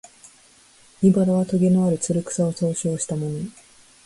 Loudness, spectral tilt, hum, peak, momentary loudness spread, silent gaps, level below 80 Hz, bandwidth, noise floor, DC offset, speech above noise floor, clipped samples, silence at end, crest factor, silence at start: -21 LUFS; -7 dB/octave; none; -6 dBFS; 9 LU; none; -58 dBFS; 11.5 kHz; -53 dBFS; under 0.1%; 33 dB; under 0.1%; 0.55 s; 16 dB; 1 s